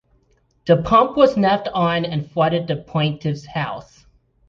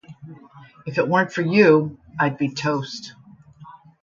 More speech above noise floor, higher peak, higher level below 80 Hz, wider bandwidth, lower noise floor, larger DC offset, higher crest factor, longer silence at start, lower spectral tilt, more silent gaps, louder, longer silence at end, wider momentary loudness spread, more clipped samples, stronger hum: first, 43 dB vs 27 dB; about the same, -2 dBFS vs -2 dBFS; first, -48 dBFS vs -62 dBFS; about the same, 7.2 kHz vs 7.6 kHz; first, -61 dBFS vs -47 dBFS; neither; about the same, 18 dB vs 20 dB; first, 0.65 s vs 0.1 s; about the same, -7.5 dB/octave vs -6.5 dB/octave; neither; about the same, -19 LUFS vs -20 LUFS; first, 0.65 s vs 0.3 s; second, 11 LU vs 21 LU; neither; neither